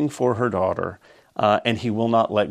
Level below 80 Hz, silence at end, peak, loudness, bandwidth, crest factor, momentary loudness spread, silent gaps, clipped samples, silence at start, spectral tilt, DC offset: -58 dBFS; 0 s; -2 dBFS; -22 LUFS; 13.5 kHz; 20 dB; 9 LU; none; under 0.1%; 0 s; -6.5 dB/octave; under 0.1%